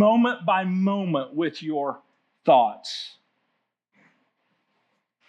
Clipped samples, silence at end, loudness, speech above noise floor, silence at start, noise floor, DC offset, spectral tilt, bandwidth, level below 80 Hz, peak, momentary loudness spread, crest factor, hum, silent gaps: under 0.1%; 2.2 s; -24 LUFS; 54 dB; 0 s; -76 dBFS; under 0.1%; -6.5 dB/octave; 9.2 kHz; under -90 dBFS; -6 dBFS; 14 LU; 20 dB; none; none